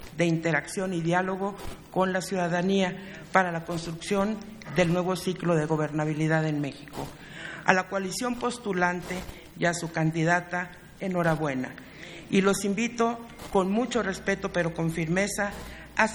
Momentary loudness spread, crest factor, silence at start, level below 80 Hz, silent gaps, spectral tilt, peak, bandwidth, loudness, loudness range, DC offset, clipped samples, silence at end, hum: 12 LU; 26 dB; 0 s; -52 dBFS; none; -5.5 dB/octave; -2 dBFS; over 20 kHz; -27 LUFS; 1 LU; under 0.1%; under 0.1%; 0 s; none